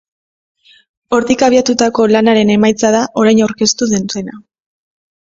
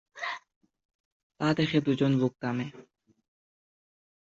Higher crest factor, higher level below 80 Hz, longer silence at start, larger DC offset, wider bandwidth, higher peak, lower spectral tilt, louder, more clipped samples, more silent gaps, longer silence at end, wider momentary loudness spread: second, 14 dB vs 20 dB; first, -50 dBFS vs -68 dBFS; first, 1.1 s vs 0.15 s; neither; about the same, 7.8 kHz vs 7.8 kHz; first, 0 dBFS vs -12 dBFS; second, -4 dB/octave vs -7 dB/octave; first, -12 LUFS vs -29 LUFS; neither; second, none vs 0.56-0.61 s, 0.85-0.89 s, 0.95-1.30 s; second, 0.8 s vs 1.55 s; second, 7 LU vs 11 LU